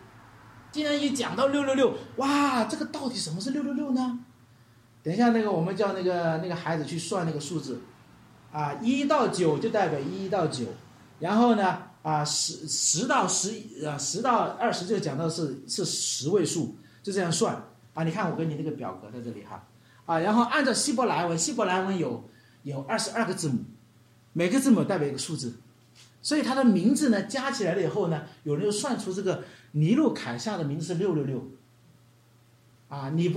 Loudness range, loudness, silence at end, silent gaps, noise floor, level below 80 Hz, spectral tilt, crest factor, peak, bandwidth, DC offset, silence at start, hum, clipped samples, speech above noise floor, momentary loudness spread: 4 LU; -27 LUFS; 0 s; none; -59 dBFS; -70 dBFS; -4.5 dB/octave; 18 dB; -10 dBFS; 15 kHz; under 0.1%; 0 s; none; under 0.1%; 32 dB; 14 LU